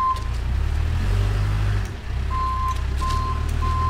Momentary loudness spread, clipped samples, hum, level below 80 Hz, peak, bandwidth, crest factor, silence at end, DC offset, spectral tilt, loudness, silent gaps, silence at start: 4 LU; under 0.1%; none; -24 dBFS; -10 dBFS; 15 kHz; 12 dB; 0 s; under 0.1%; -6 dB/octave; -24 LUFS; none; 0 s